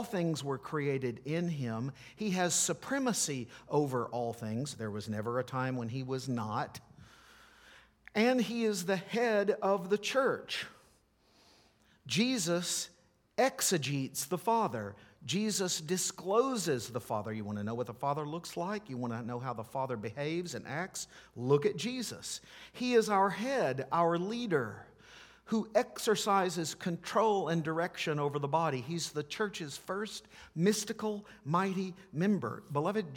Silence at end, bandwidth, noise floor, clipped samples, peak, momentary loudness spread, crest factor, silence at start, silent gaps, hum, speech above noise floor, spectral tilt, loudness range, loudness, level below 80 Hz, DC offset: 0 s; 19 kHz; -68 dBFS; under 0.1%; -14 dBFS; 10 LU; 20 dB; 0 s; none; none; 35 dB; -4.5 dB/octave; 5 LU; -34 LUFS; -72 dBFS; under 0.1%